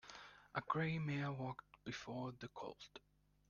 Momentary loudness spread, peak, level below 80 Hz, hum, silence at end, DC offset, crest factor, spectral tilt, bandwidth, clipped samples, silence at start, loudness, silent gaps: 17 LU; -24 dBFS; -74 dBFS; 50 Hz at -65 dBFS; 0.5 s; under 0.1%; 22 dB; -6.5 dB/octave; 7.2 kHz; under 0.1%; 0.05 s; -45 LUFS; none